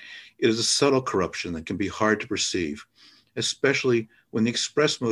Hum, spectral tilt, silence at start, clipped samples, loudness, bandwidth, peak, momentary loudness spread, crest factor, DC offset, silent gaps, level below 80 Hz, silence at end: none; -3.5 dB/octave; 0 s; under 0.1%; -24 LUFS; 12.5 kHz; -8 dBFS; 11 LU; 18 dB; under 0.1%; none; -54 dBFS; 0 s